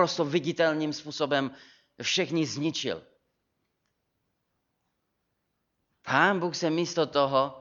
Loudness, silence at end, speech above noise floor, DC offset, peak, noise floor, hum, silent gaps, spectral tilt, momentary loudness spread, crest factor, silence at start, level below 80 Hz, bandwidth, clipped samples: -27 LUFS; 0 s; 52 dB; under 0.1%; -6 dBFS; -79 dBFS; none; none; -4 dB/octave; 9 LU; 22 dB; 0 s; -74 dBFS; 7.6 kHz; under 0.1%